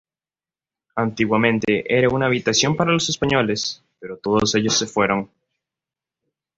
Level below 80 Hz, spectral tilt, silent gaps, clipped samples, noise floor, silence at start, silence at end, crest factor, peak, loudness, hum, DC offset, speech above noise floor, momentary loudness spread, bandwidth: -52 dBFS; -4 dB/octave; none; under 0.1%; under -90 dBFS; 0.95 s; 1.3 s; 20 dB; -2 dBFS; -19 LUFS; none; under 0.1%; over 71 dB; 11 LU; 8 kHz